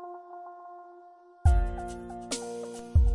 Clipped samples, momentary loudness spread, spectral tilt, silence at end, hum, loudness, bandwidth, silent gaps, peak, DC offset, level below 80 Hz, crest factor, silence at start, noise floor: under 0.1%; 21 LU; -6 dB/octave; 0 s; none; -31 LUFS; 11.5 kHz; none; -12 dBFS; under 0.1%; -32 dBFS; 18 dB; 0 s; -53 dBFS